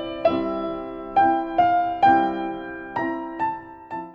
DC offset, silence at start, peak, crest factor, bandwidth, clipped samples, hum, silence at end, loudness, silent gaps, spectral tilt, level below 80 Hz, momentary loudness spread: under 0.1%; 0 s; -6 dBFS; 16 dB; 5.8 kHz; under 0.1%; none; 0 s; -22 LUFS; none; -7.5 dB/octave; -52 dBFS; 14 LU